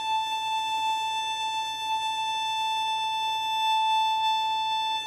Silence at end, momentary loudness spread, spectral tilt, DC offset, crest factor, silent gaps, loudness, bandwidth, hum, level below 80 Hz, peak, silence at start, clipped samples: 0 s; 4 LU; 1 dB/octave; under 0.1%; 10 dB; none; -26 LUFS; 15 kHz; none; -72 dBFS; -16 dBFS; 0 s; under 0.1%